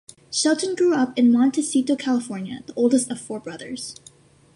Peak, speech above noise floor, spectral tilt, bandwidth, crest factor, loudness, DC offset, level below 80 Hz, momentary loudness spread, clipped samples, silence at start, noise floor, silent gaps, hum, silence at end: -6 dBFS; 30 dB; -3.5 dB/octave; 11.5 kHz; 16 dB; -21 LUFS; under 0.1%; -68 dBFS; 15 LU; under 0.1%; 0.3 s; -51 dBFS; none; none; 0.6 s